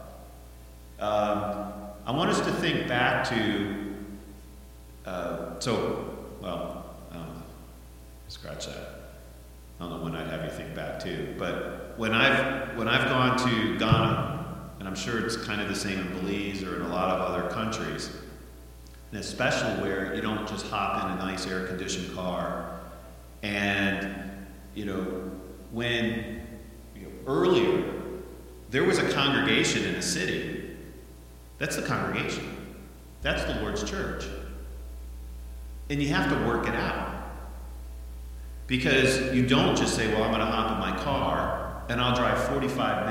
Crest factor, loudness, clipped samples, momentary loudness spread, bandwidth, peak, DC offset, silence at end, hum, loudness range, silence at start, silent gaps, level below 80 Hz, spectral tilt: 24 dB; -28 LUFS; under 0.1%; 21 LU; 17 kHz; -6 dBFS; under 0.1%; 0 s; none; 9 LU; 0 s; none; -44 dBFS; -4.5 dB/octave